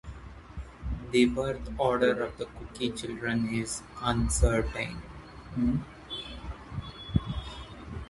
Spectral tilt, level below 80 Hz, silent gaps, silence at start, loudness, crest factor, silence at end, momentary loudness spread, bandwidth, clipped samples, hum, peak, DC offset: -5 dB/octave; -38 dBFS; none; 0.05 s; -31 LUFS; 22 dB; 0 s; 18 LU; 11.5 kHz; under 0.1%; none; -10 dBFS; under 0.1%